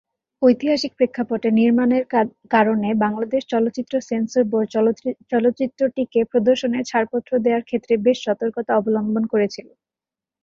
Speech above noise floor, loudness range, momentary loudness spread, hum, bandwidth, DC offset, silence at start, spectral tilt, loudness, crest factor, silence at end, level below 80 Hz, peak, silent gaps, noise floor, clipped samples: 70 dB; 2 LU; 5 LU; none; 7.4 kHz; under 0.1%; 0.4 s; -6 dB/octave; -20 LUFS; 18 dB; 0.8 s; -62 dBFS; -2 dBFS; none; -89 dBFS; under 0.1%